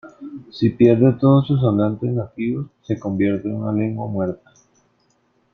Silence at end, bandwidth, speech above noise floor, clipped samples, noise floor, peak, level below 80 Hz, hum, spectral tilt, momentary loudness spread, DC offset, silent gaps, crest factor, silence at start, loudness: 1.2 s; 6.4 kHz; 45 dB; under 0.1%; -63 dBFS; -2 dBFS; -54 dBFS; none; -10 dB/octave; 14 LU; under 0.1%; none; 18 dB; 0.05 s; -19 LUFS